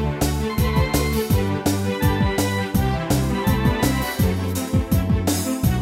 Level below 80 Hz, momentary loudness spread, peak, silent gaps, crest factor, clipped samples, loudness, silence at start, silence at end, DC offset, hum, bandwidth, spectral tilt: -28 dBFS; 2 LU; -6 dBFS; none; 14 dB; under 0.1%; -21 LUFS; 0 s; 0 s; under 0.1%; none; 16.5 kHz; -5.5 dB/octave